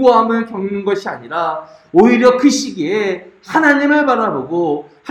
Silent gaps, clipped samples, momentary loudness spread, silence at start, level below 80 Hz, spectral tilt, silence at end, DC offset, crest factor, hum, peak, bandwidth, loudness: none; under 0.1%; 11 LU; 0 s; -54 dBFS; -4.5 dB/octave; 0 s; under 0.1%; 14 dB; none; 0 dBFS; 13 kHz; -14 LUFS